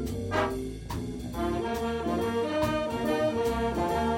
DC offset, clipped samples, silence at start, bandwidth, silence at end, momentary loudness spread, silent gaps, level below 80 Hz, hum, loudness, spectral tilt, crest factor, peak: under 0.1%; under 0.1%; 0 s; 17 kHz; 0 s; 8 LU; none; -42 dBFS; none; -30 LUFS; -6 dB/octave; 16 dB; -14 dBFS